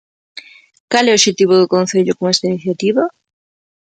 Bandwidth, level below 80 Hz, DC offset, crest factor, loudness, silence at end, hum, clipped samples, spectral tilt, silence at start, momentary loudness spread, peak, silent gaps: 9.2 kHz; -62 dBFS; under 0.1%; 16 dB; -14 LUFS; 0.85 s; none; under 0.1%; -3.5 dB/octave; 0.35 s; 15 LU; 0 dBFS; 0.80-0.88 s